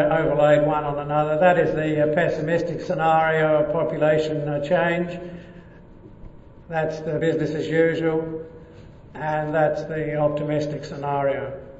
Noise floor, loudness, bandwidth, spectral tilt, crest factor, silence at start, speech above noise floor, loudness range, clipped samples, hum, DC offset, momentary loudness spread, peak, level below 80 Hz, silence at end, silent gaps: -44 dBFS; -22 LUFS; 8 kHz; -7.5 dB/octave; 18 dB; 0 s; 23 dB; 6 LU; under 0.1%; none; under 0.1%; 12 LU; -4 dBFS; -48 dBFS; 0 s; none